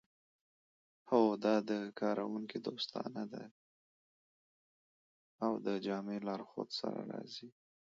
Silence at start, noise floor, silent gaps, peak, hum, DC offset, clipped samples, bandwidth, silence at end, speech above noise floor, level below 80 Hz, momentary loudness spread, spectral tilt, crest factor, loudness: 1.05 s; under -90 dBFS; 3.51-5.39 s; -16 dBFS; none; under 0.1%; under 0.1%; 7.4 kHz; 0.35 s; over 53 dB; -86 dBFS; 14 LU; -4.5 dB/octave; 24 dB; -38 LUFS